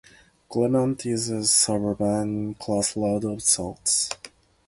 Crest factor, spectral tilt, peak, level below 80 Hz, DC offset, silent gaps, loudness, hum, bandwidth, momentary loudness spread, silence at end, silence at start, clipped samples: 20 dB; -3.5 dB/octave; -6 dBFS; -54 dBFS; under 0.1%; none; -23 LUFS; none; 12 kHz; 10 LU; 0.4 s; 0.5 s; under 0.1%